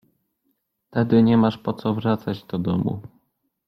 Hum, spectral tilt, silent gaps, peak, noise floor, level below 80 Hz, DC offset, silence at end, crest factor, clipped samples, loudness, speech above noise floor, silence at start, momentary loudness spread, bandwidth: none; -9.5 dB/octave; none; -4 dBFS; -72 dBFS; -56 dBFS; under 0.1%; 0.6 s; 18 dB; under 0.1%; -22 LUFS; 52 dB; 0.95 s; 12 LU; 5.8 kHz